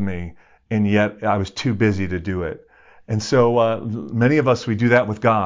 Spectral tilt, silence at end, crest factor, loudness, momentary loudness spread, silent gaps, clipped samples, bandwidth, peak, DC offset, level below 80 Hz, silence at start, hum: -7 dB/octave; 0 s; 16 dB; -20 LUFS; 10 LU; none; under 0.1%; 7.6 kHz; -2 dBFS; under 0.1%; -42 dBFS; 0 s; none